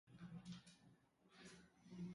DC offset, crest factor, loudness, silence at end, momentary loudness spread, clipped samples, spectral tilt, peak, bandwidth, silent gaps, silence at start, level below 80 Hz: under 0.1%; 16 dB; -60 LUFS; 0 s; 10 LU; under 0.1%; -5.5 dB/octave; -44 dBFS; 11.5 kHz; none; 0.05 s; -82 dBFS